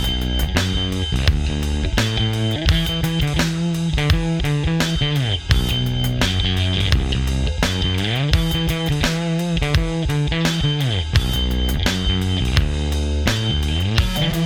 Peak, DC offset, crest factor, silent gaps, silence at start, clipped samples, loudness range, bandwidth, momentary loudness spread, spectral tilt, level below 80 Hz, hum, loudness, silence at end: 0 dBFS; under 0.1%; 18 dB; none; 0 s; under 0.1%; 1 LU; 20 kHz; 2 LU; -5 dB/octave; -24 dBFS; none; -20 LUFS; 0 s